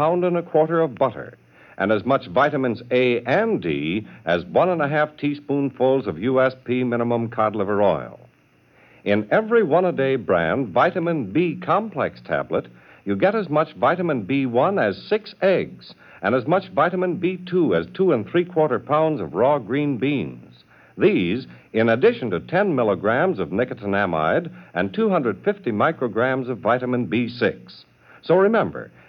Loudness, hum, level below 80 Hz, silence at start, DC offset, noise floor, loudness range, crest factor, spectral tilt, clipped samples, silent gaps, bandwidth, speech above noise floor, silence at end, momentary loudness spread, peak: -21 LUFS; none; -60 dBFS; 0 s; under 0.1%; -57 dBFS; 2 LU; 16 dB; -9 dB/octave; under 0.1%; none; 6.2 kHz; 36 dB; 0.2 s; 7 LU; -4 dBFS